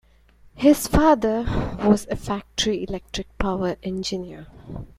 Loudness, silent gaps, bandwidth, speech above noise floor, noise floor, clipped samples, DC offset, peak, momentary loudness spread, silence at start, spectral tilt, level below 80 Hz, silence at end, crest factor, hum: -22 LUFS; none; 16 kHz; 31 dB; -53 dBFS; under 0.1%; under 0.1%; -4 dBFS; 15 LU; 0.55 s; -5 dB/octave; -36 dBFS; 0.15 s; 20 dB; none